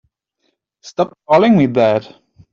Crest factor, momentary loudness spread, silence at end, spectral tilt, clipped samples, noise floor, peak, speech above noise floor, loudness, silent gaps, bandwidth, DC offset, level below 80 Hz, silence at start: 16 dB; 10 LU; 0.5 s; -7.5 dB/octave; under 0.1%; -68 dBFS; 0 dBFS; 54 dB; -14 LUFS; none; 7.4 kHz; under 0.1%; -56 dBFS; 0.85 s